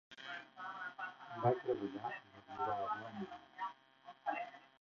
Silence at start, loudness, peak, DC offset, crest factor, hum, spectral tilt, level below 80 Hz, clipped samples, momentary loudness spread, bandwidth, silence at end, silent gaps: 0.1 s; -43 LUFS; -20 dBFS; under 0.1%; 22 dB; none; -4.5 dB/octave; -80 dBFS; under 0.1%; 13 LU; 7 kHz; 0.15 s; none